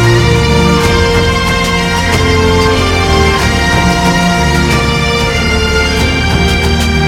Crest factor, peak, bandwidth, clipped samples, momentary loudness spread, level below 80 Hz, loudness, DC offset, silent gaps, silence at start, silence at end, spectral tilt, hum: 10 dB; 0 dBFS; 16.5 kHz; under 0.1%; 2 LU; -18 dBFS; -10 LUFS; under 0.1%; none; 0 s; 0 s; -5 dB/octave; none